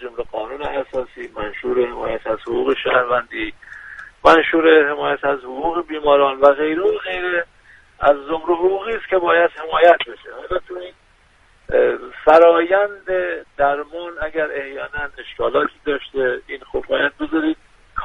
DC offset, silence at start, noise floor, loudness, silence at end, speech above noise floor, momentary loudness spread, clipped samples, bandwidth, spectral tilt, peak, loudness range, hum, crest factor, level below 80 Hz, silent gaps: under 0.1%; 0 s; -54 dBFS; -18 LUFS; 0 s; 36 dB; 15 LU; under 0.1%; 7.6 kHz; -5.5 dB/octave; 0 dBFS; 6 LU; none; 18 dB; -46 dBFS; none